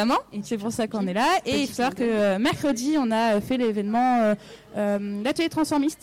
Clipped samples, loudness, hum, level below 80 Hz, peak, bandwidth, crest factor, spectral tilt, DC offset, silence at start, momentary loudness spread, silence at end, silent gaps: under 0.1%; -24 LUFS; none; -56 dBFS; -16 dBFS; 17.5 kHz; 6 dB; -5 dB/octave; under 0.1%; 0 s; 6 LU; 0.1 s; none